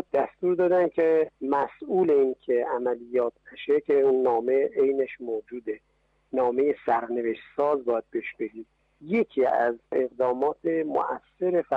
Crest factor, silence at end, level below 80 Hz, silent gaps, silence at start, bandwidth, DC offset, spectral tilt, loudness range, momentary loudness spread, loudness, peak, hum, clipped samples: 12 dB; 0 s; -68 dBFS; none; 0.15 s; 4.8 kHz; under 0.1%; -8 dB/octave; 3 LU; 11 LU; -26 LUFS; -12 dBFS; none; under 0.1%